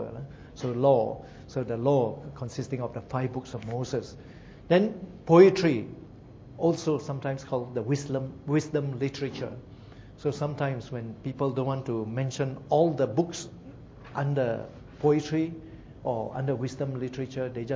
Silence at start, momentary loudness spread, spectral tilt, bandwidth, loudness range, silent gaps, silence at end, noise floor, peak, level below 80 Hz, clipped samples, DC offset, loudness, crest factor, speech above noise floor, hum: 0 s; 19 LU; -7 dB/octave; 7.8 kHz; 7 LU; none; 0 s; -47 dBFS; -4 dBFS; -56 dBFS; under 0.1%; under 0.1%; -28 LUFS; 24 dB; 20 dB; none